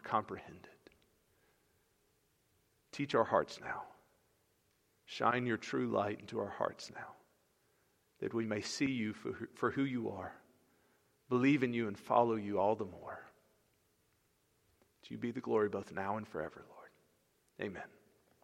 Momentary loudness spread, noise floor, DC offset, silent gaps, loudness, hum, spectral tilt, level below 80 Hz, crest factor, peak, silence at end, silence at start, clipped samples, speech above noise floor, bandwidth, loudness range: 18 LU; -76 dBFS; under 0.1%; none; -37 LUFS; none; -6 dB/octave; -76 dBFS; 24 dB; -14 dBFS; 0.55 s; 0.05 s; under 0.1%; 39 dB; 15 kHz; 6 LU